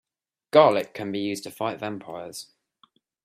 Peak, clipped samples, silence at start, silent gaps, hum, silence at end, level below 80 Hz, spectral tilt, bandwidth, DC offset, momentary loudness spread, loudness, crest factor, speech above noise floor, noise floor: -2 dBFS; under 0.1%; 0.55 s; none; none; 0.8 s; -72 dBFS; -5 dB/octave; 15 kHz; under 0.1%; 19 LU; -24 LUFS; 24 dB; 52 dB; -75 dBFS